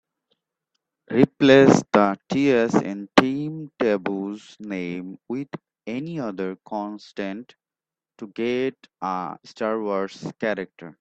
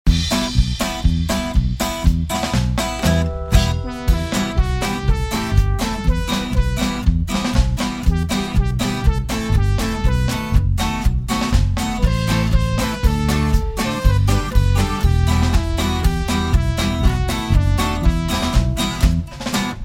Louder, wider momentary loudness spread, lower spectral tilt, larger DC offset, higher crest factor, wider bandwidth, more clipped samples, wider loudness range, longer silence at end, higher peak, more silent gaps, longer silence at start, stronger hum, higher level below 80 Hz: second, -23 LUFS vs -19 LUFS; first, 16 LU vs 3 LU; about the same, -6 dB/octave vs -5.5 dB/octave; neither; first, 24 dB vs 16 dB; second, 8.4 kHz vs 16.5 kHz; neither; first, 12 LU vs 2 LU; about the same, 0.1 s vs 0 s; about the same, 0 dBFS vs 0 dBFS; neither; first, 1.1 s vs 0.05 s; neither; second, -62 dBFS vs -20 dBFS